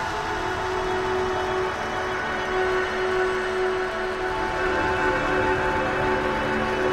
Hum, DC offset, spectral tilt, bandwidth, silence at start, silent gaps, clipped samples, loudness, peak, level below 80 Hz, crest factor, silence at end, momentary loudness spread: none; under 0.1%; -5 dB/octave; 13.5 kHz; 0 s; none; under 0.1%; -24 LUFS; -10 dBFS; -40 dBFS; 14 dB; 0 s; 4 LU